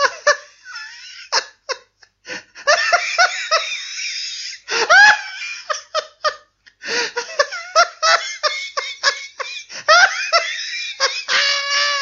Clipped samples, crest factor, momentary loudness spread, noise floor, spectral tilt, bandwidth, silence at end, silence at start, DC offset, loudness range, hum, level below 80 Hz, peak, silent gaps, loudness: under 0.1%; 18 dB; 17 LU; -51 dBFS; 2 dB/octave; 7.8 kHz; 0 s; 0 s; under 0.1%; 4 LU; none; -68 dBFS; 0 dBFS; none; -17 LUFS